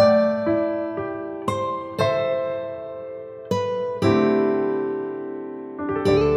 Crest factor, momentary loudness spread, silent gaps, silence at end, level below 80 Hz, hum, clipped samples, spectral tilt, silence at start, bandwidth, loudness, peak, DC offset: 16 dB; 14 LU; none; 0 s; -48 dBFS; none; under 0.1%; -7 dB/octave; 0 s; 12.5 kHz; -23 LUFS; -6 dBFS; under 0.1%